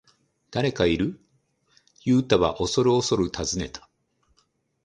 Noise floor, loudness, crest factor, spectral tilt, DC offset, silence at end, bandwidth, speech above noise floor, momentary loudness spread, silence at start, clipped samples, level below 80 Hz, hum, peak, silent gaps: -69 dBFS; -24 LUFS; 22 dB; -5 dB/octave; under 0.1%; 1.05 s; 10 kHz; 46 dB; 11 LU; 0.5 s; under 0.1%; -46 dBFS; none; -4 dBFS; none